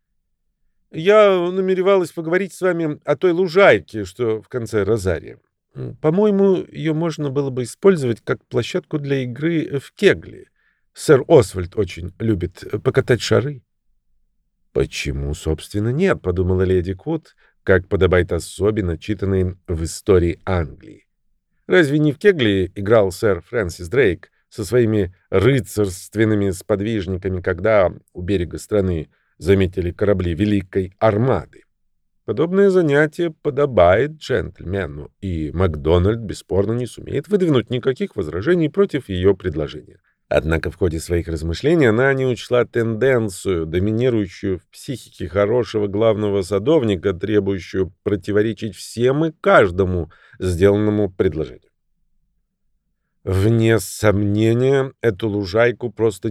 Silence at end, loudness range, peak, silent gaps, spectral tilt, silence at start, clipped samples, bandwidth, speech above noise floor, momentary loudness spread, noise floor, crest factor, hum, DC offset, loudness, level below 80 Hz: 0 s; 4 LU; -2 dBFS; none; -6.5 dB/octave; 0.95 s; under 0.1%; 14 kHz; 51 dB; 11 LU; -69 dBFS; 18 dB; none; under 0.1%; -19 LUFS; -40 dBFS